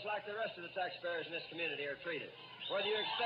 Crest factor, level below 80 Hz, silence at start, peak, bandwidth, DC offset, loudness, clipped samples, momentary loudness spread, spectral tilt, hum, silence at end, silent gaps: 14 dB; -86 dBFS; 0 s; -26 dBFS; 5.4 kHz; under 0.1%; -40 LUFS; under 0.1%; 7 LU; -5.5 dB/octave; none; 0 s; none